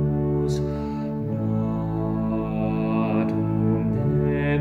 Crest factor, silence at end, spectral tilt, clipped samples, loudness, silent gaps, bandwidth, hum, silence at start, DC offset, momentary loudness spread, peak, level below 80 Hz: 12 dB; 0 s; -9 dB/octave; under 0.1%; -24 LUFS; none; 8 kHz; none; 0 s; under 0.1%; 5 LU; -10 dBFS; -40 dBFS